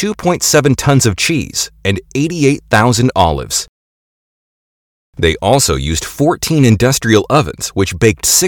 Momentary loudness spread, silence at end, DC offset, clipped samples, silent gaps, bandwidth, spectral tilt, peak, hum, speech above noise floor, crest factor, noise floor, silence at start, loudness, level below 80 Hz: 7 LU; 0 s; under 0.1%; 0.2%; 3.69-5.13 s; 19 kHz; -4 dB/octave; 0 dBFS; none; over 78 dB; 14 dB; under -90 dBFS; 0 s; -13 LUFS; -32 dBFS